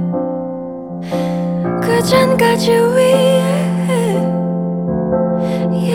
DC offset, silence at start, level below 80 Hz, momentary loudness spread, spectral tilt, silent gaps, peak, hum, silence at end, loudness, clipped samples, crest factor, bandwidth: under 0.1%; 0 s; -44 dBFS; 10 LU; -6 dB/octave; none; 0 dBFS; none; 0 s; -15 LUFS; under 0.1%; 14 dB; 16 kHz